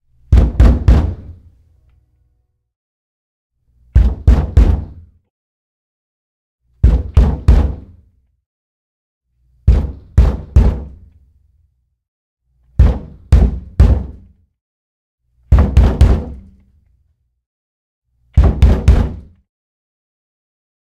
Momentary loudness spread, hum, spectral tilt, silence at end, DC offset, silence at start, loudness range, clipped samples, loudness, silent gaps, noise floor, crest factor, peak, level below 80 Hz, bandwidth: 14 LU; none; -8.5 dB/octave; 1.75 s; under 0.1%; 0.3 s; 3 LU; 0.3%; -14 LUFS; 2.76-3.50 s, 5.30-6.59 s, 8.46-9.21 s, 12.08-12.37 s, 14.61-15.18 s, 17.46-18.02 s; -63 dBFS; 16 dB; 0 dBFS; -16 dBFS; 6.2 kHz